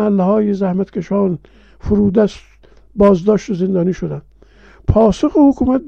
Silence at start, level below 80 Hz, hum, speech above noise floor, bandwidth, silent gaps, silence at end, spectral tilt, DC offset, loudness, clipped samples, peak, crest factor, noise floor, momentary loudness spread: 0 s; -34 dBFS; none; 31 dB; 8 kHz; none; 0 s; -8.5 dB/octave; under 0.1%; -15 LUFS; under 0.1%; -2 dBFS; 14 dB; -44 dBFS; 13 LU